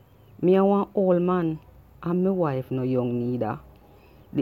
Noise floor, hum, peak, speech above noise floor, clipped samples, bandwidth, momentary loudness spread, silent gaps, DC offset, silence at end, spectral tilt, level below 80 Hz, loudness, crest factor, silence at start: -52 dBFS; none; -10 dBFS; 29 dB; under 0.1%; 4.7 kHz; 12 LU; none; under 0.1%; 0 s; -10.5 dB/octave; -56 dBFS; -24 LUFS; 16 dB; 0.4 s